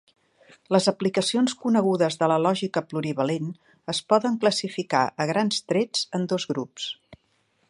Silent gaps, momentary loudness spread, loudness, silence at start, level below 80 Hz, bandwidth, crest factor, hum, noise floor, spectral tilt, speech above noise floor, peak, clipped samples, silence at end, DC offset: none; 9 LU; -24 LUFS; 0.7 s; -70 dBFS; 11.5 kHz; 20 dB; none; -68 dBFS; -4.5 dB/octave; 44 dB; -4 dBFS; under 0.1%; 0.55 s; under 0.1%